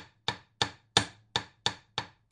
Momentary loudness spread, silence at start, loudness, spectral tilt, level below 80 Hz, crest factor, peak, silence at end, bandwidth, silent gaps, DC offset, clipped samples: 10 LU; 0 s; -32 LUFS; -2 dB/octave; -62 dBFS; 28 dB; -8 dBFS; 0.25 s; 11.5 kHz; none; under 0.1%; under 0.1%